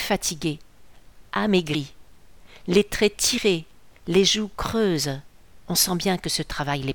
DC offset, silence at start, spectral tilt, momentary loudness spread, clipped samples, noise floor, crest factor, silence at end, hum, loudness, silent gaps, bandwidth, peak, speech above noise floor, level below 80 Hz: 0.4%; 0 s; -3.5 dB/octave; 10 LU; under 0.1%; -51 dBFS; 20 dB; 0 s; none; -23 LUFS; none; 19 kHz; -6 dBFS; 28 dB; -46 dBFS